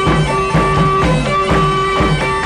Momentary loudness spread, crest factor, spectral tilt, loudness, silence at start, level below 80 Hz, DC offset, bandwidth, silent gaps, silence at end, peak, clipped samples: 2 LU; 10 dB; -6 dB/octave; -13 LUFS; 0 s; -24 dBFS; under 0.1%; 11.5 kHz; none; 0 s; -2 dBFS; under 0.1%